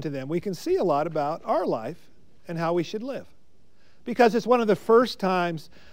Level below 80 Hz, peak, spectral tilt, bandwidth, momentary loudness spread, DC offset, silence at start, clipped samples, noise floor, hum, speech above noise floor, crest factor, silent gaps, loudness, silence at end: -62 dBFS; -6 dBFS; -6 dB/octave; 16 kHz; 16 LU; 0.6%; 0 s; under 0.1%; -63 dBFS; none; 39 dB; 20 dB; none; -24 LUFS; 0.3 s